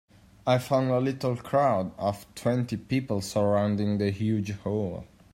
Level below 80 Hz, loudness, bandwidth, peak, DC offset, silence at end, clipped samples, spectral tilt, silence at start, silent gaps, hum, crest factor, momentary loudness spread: -60 dBFS; -27 LUFS; 16 kHz; -10 dBFS; under 0.1%; 0.25 s; under 0.1%; -7 dB/octave; 0.45 s; none; none; 16 dB; 7 LU